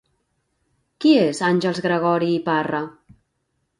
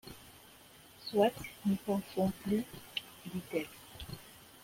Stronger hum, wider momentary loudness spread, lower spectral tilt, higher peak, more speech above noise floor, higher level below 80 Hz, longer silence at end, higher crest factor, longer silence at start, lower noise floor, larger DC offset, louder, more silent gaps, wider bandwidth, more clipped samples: neither; second, 9 LU vs 23 LU; about the same, -6 dB/octave vs -6 dB/octave; first, -4 dBFS vs -16 dBFS; first, 54 dB vs 24 dB; about the same, -64 dBFS vs -62 dBFS; first, 0.9 s vs 0.2 s; about the same, 18 dB vs 22 dB; first, 1 s vs 0.05 s; first, -72 dBFS vs -58 dBFS; neither; first, -20 LUFS vs -36 LUFS; neither; second, 10.5 kHz vs 16.5 kHz; neither